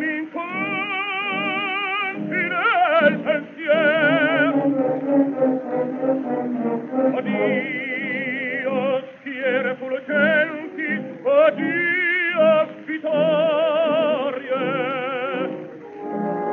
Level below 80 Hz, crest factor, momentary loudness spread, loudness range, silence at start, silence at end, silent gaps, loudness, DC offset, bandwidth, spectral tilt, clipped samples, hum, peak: -78 dBFS; 18 dB; 9 LU; 4 LU; 0 s; 0 s; none; -21 LUFS; under 0.1%; 4.4 kHz; -7.5 dB/octave; under 0.1%; none; -4 dBFS